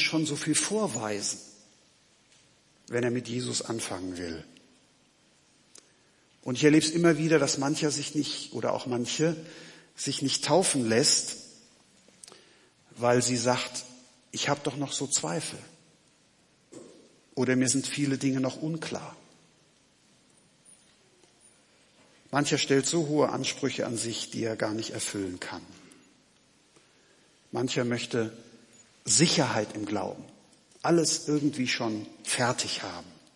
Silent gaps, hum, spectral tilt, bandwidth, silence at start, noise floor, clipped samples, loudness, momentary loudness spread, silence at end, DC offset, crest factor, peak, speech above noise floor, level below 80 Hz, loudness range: none; none; -3.5 dB/octave; 11.5 kHz; 0 s; -64 dBFS; under 0.1%; -28 LUFS; 16 LU; 0.2 s; under 0.1%; 22 dB; -8 dBFS; 36 dB; -74 dBFS; 8 LU